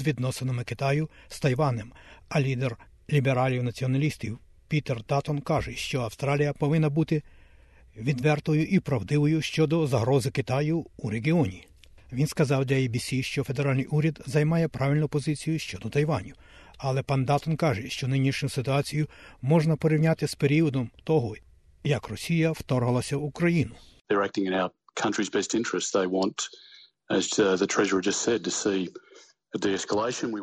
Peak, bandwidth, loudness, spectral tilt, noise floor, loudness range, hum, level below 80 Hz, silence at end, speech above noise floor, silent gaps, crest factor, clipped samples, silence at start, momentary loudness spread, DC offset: -10 dBFS; 12.5 kHz; -27 LUFS; -6 dB/octave; -54 dBFS; 2 LU; none; -54 dBFS; 0 s; 28 dB; 24.01-24.05 s; 16 dB; under 0.1%; 0 s; 7 LU; under 0.1%